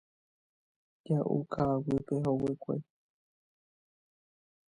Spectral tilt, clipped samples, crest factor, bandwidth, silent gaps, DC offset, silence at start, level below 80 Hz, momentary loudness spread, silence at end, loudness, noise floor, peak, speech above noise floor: -10 dB/octave; under 0.1%; 18 dB; 10 kHz; none; under 0.1%; 1.05 s; -62 dBFS; 7 LU; 1.95 s; -33 LUFS; under -90 dBFS; -18 dBFS; over 59 dB